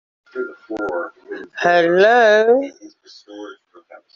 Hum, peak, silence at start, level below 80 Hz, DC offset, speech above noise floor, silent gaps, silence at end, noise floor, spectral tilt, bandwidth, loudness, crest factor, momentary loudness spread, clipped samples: none; -2 dBFS; 0.35 s; -66 dBFS; under 0.1%; 29 dB; none; 0.65 s; -46 dBFS; -5 dB/octave; 7.2 kHz; -15 LUFS; 16 dB; 24 LU; under 0.1%